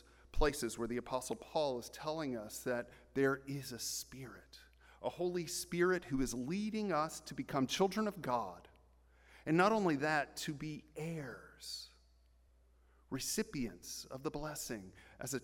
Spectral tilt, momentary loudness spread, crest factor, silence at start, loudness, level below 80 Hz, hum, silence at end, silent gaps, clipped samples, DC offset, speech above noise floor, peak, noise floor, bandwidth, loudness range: -4.5 dB/octave; 14 LU; 22 dB; 0.35 s; -39 LUFS; -54 dBFS; none; 0 s; none; under 0.1%; under 0.1%; 30 dB; -18 dBFS; -68 dBFS; 17 kHz; 8 LU